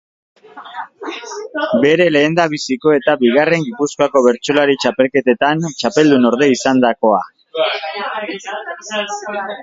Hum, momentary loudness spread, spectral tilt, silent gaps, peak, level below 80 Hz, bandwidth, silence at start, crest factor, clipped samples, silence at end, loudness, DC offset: none; 14 LU; -4.5 dB/octave; none; 0 dBFS; -60 dBFS; 7.8 kHz; 0.55 s; 16 dB; under 0.1%; 0 s; -15 LUFS; under 0.1%